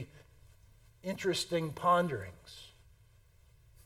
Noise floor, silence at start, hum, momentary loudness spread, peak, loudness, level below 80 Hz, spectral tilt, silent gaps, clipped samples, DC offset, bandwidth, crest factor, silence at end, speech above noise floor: -63 dBFS; 0 s; none; 23 LU; -16 dBFS; -33 LUFS; -64 dBFS; -4.5 dB/octave; none; under 0.1%; under 0.1%; 16.5 kHz; 20 dB; 1.2 s; 30 dB